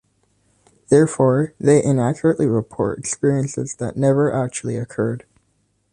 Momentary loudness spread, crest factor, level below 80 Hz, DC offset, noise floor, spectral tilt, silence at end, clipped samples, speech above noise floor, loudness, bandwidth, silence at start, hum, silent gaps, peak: 10 LU; 18 dB; -54 dBFS; under 0.1%; -66 dBFS; -7 dB/octave; 0.75 s; under 0.1%; 47 dB; -19 LUFS; 11 kHz; 0.9 s; none; none; -2 dBFS